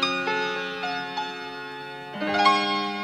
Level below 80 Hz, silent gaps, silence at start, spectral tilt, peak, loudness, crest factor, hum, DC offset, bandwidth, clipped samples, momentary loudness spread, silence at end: -68 dBFS; none; 0 s; -3.5 dB/octave; -6 dBFS; -25 LUFS; 20 dB; none; under 0.1%; 15 kHz; under 0.1%; 15 LU; 0 s